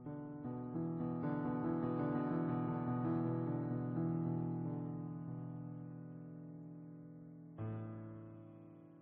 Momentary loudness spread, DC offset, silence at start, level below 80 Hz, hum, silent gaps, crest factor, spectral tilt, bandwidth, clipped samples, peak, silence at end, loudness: 16 LU; under 0.1%; 0 s; -72 dBFS; none; none; 14 dB; -10.5 dB/octave; 4 kHz; under 0.1%; -26 dBFS; 0 s; -41 LUFS